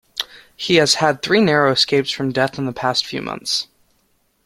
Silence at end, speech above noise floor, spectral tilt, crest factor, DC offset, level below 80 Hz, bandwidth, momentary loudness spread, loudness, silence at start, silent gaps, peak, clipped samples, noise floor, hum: 0.8 s; 46 dB; -3.5 dB/octave; 18 dB; under 0.1%; -56 dBFS; 15.5 kHz; 13 LU; -17 LUFS; 0.15 s; none; 0 dBFS; under 0.1%; -63 dBFS; none